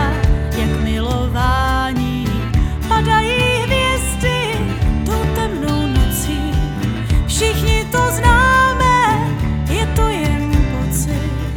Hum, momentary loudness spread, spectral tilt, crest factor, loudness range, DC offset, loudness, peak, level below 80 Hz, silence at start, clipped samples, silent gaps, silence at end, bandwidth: none; 6 LU; -5 dB/octave; 14 dB; 3 LU; under 0.1%; -16 LUFS; 0 dBFS; -20 dBFS; 0 s; under 0.1%; none; 0 s; 18.5 kHz